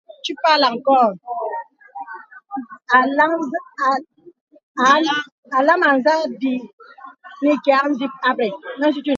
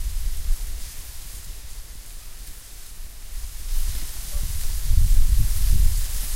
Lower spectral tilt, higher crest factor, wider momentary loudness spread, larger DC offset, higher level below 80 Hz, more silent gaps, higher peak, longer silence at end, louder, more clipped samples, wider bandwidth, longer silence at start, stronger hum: about the same, -3.5 dB/octave vs -3 dB/octave; about the same, 18 dB vs 16 dB; about the same, 17 LU vs 18 LU; neither; second, -78 dBFS vs -22 dBFS; first, 4.41-4.47 s, 4.63-4.75 s, 5.32-5.43 s, 6.73-6.78 s vs none; first, 0 dBFS vs -4 dBFS; about the same, 0 s vs 0 s; first, -18 LUFS vs -28 LUFS; neither; second, 7.4 kHz vs 16 kHz; about the same, 0.1 s vs 0 s; neither